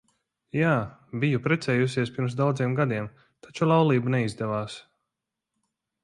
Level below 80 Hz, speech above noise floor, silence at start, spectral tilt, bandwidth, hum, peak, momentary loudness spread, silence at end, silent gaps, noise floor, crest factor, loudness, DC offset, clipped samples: -62 dBFS; 60 dB; 0.55 s; -7 dB/octave; 11.5 kHz; none; -10 dBFS; 13 LU; 1.25 s; none; -85 dBFS; 18 dB; -26 LUFS; under 0.1%; under 0.1%